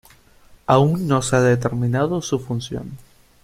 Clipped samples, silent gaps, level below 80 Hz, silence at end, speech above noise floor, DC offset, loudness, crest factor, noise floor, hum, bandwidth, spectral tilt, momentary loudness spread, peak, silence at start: under 0.1%; none; -48 dBFS; 0.45 s; 31 dB; under 0.1%; -19 LUFS; 20 dB; -50 dBFS; none; 15 kHz; -6 dB/octave; 14 LU; 0 dBFS; 0.7 s